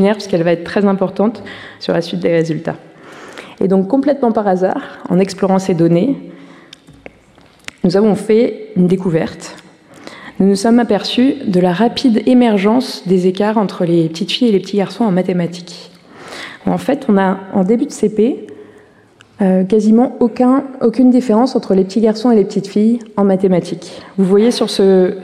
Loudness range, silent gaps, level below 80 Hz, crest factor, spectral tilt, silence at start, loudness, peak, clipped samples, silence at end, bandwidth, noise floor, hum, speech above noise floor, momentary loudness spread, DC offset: 4 LU; none; -54 dBFS; 12 dB; -7 dB/octave; 0 s; -14 LUFS; -2 dBFS; under 0.1%; 0 s; 12.5 kHz; -46 dBFS; none; 33 dB; 14 LU; under 0.1%